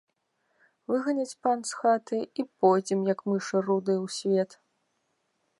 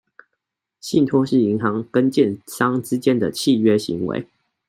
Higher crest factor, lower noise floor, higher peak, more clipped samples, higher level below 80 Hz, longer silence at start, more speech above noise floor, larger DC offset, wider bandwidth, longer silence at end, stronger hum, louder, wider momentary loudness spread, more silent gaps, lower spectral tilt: about the same, 20 dB vs 16 dB; about the same, -76 dBFS vs -79 dBFS; second, -10 dBFS vs -4 dBFS; neither; second, -82 dBFS vs -62 dBFS; about the same, 0.9 s vs 0.85 s; second, 49 dB vs 60 dB; neither; second, 11.5 kHz vs 16 kHz; first, 1.15 s vs 0.45 s; neither; second, -28 LUFS vs -19 LUFS; about the same, 8 LU vs 7 LU; neither; about the same, -5.5 dB/octave vs -6 dB/octave